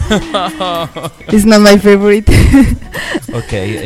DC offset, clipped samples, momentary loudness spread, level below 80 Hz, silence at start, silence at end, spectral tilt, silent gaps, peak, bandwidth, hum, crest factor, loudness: under 0.1%; 1%; 14 LU; -20 dBFS; 0 s; 0 s; -5.5 dB/octave; none; 0 dBFS; 17 kHz; none; 10 dB; -10 LUFS